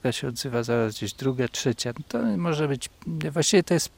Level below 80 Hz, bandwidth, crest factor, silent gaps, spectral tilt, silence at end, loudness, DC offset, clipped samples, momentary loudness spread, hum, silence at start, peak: -58 dBFS; 16.5 kHz; 18 dB; none; -4.5 dB/octave; 0.1 s; -26 LUFS; under 0.1%; under 0.1%; 9 LU; none; 0.05 s; -8 dBFS